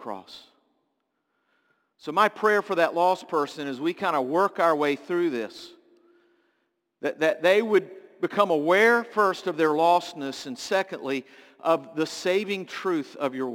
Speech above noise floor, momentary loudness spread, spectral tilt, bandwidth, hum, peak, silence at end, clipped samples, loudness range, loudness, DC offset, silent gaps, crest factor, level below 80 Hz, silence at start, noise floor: 52 dB; 13 LU; -4.5 dB/octave; 17 kHz; none; -6 dBFS; 0 s; under 0.1%; 5 LU; -25 LUFS; under 0.1%; none; 20 dB; -78 dBFS; 0 s; -76 dBFS